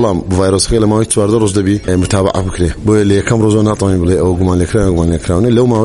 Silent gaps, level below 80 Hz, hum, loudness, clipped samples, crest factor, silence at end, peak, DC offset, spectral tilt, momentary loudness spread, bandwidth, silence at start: none; -26 dBFS; none; -12 LUFS; under 0.1%; 10 dB; 0 s; 0 dBFS; under 0.1%; -6 dB/octave; 3 LU; 11.5 kHz; 0 s